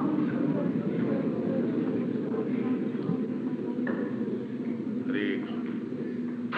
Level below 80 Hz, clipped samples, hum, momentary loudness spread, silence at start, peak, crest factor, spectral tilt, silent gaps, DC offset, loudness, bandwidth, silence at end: -74 dBFS; under 0.1%; none; 5 LU; 0 s; -16 dBFS; 14 dB; -9.5 dB/octave; none; under 0.1%; -30 LUFS; 4.9 kHz; 0 s